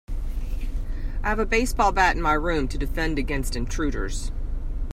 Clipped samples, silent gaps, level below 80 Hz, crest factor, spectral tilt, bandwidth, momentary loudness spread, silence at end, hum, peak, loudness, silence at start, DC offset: under 0.1%; none; -26 dBFS; 18 dB; -5 dB/octave; 14.5 kHz; 13 LU; 0 s; none; -6 dBFS; -26 LUFS; 0.1 s; under 0.1%